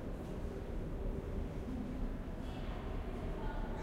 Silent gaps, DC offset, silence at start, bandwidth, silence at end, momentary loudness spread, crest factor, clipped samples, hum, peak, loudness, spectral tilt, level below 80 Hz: none; under 0.1%; 0 s; 11 kHz; 0 s; 2 LU; 12 dB; under 0.1%; none; -28 dBFS; -44 LUFS; -7.5 dB/octave; -42 dBFS